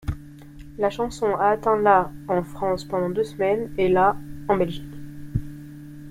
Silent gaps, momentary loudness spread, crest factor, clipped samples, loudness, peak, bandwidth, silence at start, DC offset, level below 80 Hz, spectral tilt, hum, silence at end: none; 20 LU; 20 dB; under 0.1%; -23 LUFS; -4 dBFS; 16 kHz; 0.05 s; under 0.1%; -42 dBFS; -7 dB/octave; none; 0 s